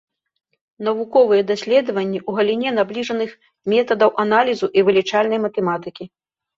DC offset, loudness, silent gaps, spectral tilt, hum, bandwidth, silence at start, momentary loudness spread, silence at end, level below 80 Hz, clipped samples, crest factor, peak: under 0.1%; -18 LUFS; none; -5.5 dB/octave; none; 7.6 kHz; 0.8 s; 11 LU; 0.5 s; -64 dBFS; under 0.1%; 16 dB; -2 dBFS